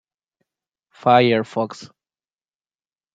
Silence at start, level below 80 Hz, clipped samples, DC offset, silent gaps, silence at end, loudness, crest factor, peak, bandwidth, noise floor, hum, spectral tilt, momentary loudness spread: 1.05 s; -68 dBFS; under 0.1%; under 0.1%; none; 1.3 s; -18 LUFS; 22 dB; -2 dBFS; 7.8 kHz; under -90 dBFS; none; -6.5 dB/octave; 14 LU